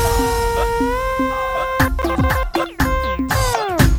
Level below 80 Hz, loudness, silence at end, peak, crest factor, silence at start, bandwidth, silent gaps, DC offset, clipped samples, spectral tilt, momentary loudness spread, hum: -24 dBFS; -19 LUFS; 0 s; 0 dBFS; 18 dB; 0 s; over 20 kHz; none; under 0.1%; under 0.1%; -5 dB/octave; 2 LU; none